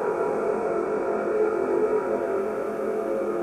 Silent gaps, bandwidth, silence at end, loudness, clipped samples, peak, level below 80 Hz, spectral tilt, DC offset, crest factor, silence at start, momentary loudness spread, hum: none; 13 kHz; 0 s; -26 LUFS; under 0.1%; -12 dBFS; -62 dBFS; -7 dB/octave; under 0.1%; 12 dB; 0 s; 4 LU; none